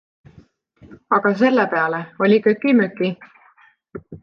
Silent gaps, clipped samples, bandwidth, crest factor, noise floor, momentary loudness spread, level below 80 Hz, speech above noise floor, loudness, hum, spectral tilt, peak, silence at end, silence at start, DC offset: none; under 0.1%; 6.6 kHz; 16 dB; -54 dBFS; 21 LU; -62 dBFS; 36 dB; -18 LUFS; none; -8 dB/octave; -4 dBFS; 0.05 s; 0.9 s; under 0.1%